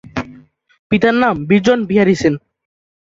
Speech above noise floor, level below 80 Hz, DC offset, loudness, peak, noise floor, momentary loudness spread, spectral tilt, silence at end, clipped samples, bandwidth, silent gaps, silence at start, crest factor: 30 dB; -46 dBFS; under 0.1%; -14 LUFS; 0 dBFS; -43 dBFS; 14 LU; -6.5 dB/octave; 0.75 s; under 0.1%; 7.8 kHz; 0.79-0.90 s; 0.15 s; 16 dB